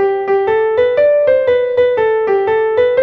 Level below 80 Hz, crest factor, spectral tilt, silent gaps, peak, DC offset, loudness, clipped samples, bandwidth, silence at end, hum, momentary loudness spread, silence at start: -50 dBFS; 10 dB; -6.5 dB/octave; none; -2 dBFS; under 0.1%; -13 LUFS; under 0.1%; 4.9 kHz; 0 s; none; 3 LU; 0 s